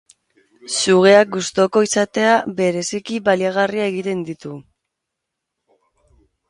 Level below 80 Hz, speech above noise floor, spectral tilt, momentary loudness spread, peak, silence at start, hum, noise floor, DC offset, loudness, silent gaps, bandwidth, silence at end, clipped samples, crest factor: -62 dBFS; 63 dB; -4 dB/octave; 14 LU; 0 dBFS; 0.65 s; none; -80 dBFS; under 0.1%; -17 LUFS; none; 11.5 kHz; 1.9 s; under 0.1%; 18 dB